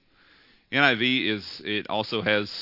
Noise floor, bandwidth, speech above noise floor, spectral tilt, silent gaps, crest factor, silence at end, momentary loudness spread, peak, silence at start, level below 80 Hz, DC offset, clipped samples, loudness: -58 dBFS; 5.8 kHz; 33 dB; -5.5 dB/octave; none; 24 dB; 0 s; 10 LU; -2 dBFS; 0.7 s; -70 dBFS; under 0.1%; under 0.1%; -24 LUFS